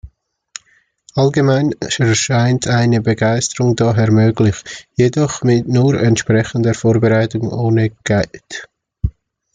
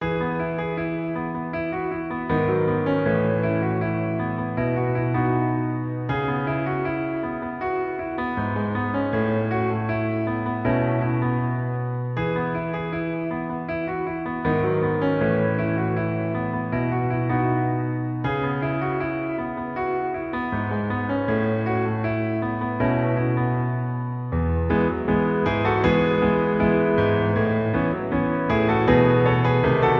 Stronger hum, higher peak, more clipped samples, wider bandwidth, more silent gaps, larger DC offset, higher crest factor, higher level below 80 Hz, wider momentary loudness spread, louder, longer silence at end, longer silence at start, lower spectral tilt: neither; about the same, -2 dBFS vs -4 dBFS; neither; first, 9.4 kHz vs 5.8 kHz; neither; neither; about the same, 14 dB vs 18 dB; about the same, -38 dBFS vs -42 dBFS; first, 12 LU vs 8 LU; first, -15 LUFS vs -23 LUFS; first, 0.45 s vs 0 s; about the same, 0.05 s vs 0 s; second, -6 dB/octave vs -10 dB/octave